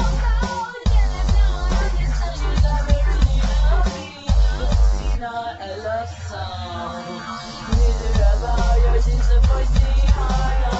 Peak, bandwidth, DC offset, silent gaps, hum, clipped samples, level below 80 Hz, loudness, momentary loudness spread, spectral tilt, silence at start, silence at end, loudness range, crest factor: -4 dBFS; 8 kHz; under 0.1%; none; none; under 0.1%; -18 dBFS; -21 LUFS; 10 LU; -6 dB/octave; 0 s; 0 s; 5 LU; 14 dB